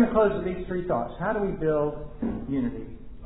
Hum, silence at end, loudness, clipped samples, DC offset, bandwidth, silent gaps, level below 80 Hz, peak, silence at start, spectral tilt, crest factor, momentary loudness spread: none; 0 s; -28 LUFS; under 0.1%; under 0.1%; 4 kHz; none; -42 dBFS; -10 dBFS; 0 s; -11.5 dB/octave; 16 dB; 9 LU